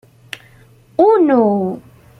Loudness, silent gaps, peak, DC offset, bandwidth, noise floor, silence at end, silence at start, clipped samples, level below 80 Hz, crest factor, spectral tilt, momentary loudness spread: -14 LUFS; none; -2 dBFS; under 0.1%; 12.5 kHz; -47 dBFS; 0.4 s; 1 s; under 0.1%; -58 dBFS; 14 dB; -8 dB/octave; 22 LU